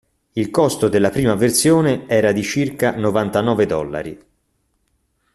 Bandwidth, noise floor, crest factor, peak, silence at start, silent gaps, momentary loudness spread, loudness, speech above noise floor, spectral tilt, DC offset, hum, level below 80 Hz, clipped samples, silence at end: 14 kHz; -67 dBFS; 16 dB; -2 dBFS; 0.35 s; none; 10 LU; -17 LUFS; 50 dB; -5 dB/octave; under 0.1%; none; -48 dBFS; under 0.1%; 1.2 s